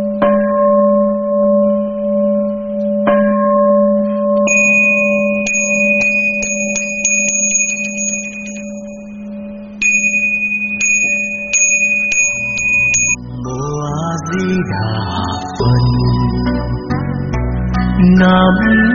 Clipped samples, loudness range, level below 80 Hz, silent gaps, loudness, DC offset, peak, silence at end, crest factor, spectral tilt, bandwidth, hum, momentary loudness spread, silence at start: under 0.1%; 5 LU; -30 dBFS; none; -13 LUFS; under 0.1%; 0 dBFS; 0 s; 14 dB; -5.5 dB/octave; 7.6 kHz; none; 10 LU; 0 s